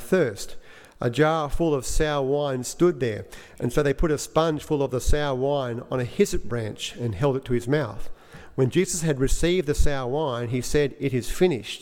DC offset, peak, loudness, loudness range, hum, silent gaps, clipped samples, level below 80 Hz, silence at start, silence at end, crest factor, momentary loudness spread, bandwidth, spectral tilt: under 0.1%; -6 dBFS; -25 LUFS; 2 LU; none; none; under 0.1%; -34 dBFS; 0 s; 0 s; 16 dB; 8 LU; 16.5 kHz; -5.5 dB/octave